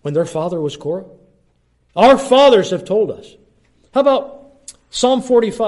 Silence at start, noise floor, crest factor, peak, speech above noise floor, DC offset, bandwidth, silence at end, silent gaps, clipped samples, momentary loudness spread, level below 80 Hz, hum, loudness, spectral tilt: 0.05 s; -59 dBFS; 16 dB; 0 dBFS; 45 dB; under 0.1%; 11.5 kHz; 0 s; none; under 0.1%; 17 LU; -52 dBFS; none; -15 LUFS; -5 dB/octave